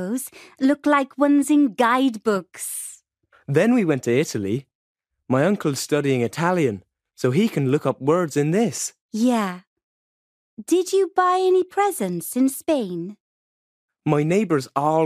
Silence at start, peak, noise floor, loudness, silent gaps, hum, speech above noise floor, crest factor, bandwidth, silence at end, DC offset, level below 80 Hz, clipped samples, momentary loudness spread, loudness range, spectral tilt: 0 s; -4 dBFS; -60 dBFS; -21 LUFS; 4.75-4.95 s, 9.01-9.09 s, 9.67-9.76 s, 9.83-10.57 s, 13.20-13.88 s; none; 40 dB; 16 dB; 15.5 kHz; 0 s; under 0.1%; -68 dBFS; under 0.1%; 11 LU; 3 LU; -5.5 dB/octave